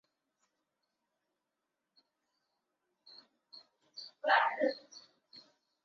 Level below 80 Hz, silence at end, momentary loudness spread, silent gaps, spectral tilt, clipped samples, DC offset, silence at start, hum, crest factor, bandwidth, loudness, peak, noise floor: under -90 dBFS; 0.45 s; 27 LU; none; 2 dB/octave; under 0.1%; under 0.1%; 3.55 s; none; 24 dB; 7.2 kHz; -32 LUFS; -16 dBFS; -87 dBFS